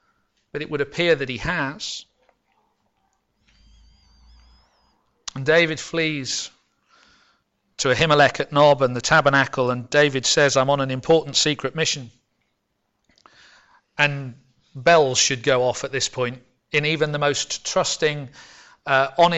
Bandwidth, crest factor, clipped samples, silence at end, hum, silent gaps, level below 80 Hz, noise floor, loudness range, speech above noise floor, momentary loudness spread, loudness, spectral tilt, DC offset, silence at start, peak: 8.4 kHz; 18 dB; under 0.1%; 0 s; none; none; -52 dBFS; -73 dBFS; 9 LU; 53 dB; 14 LU; -20 LUFS; -3.5 dB/octave; under 0.1%; 0.55 s; -6 dBFS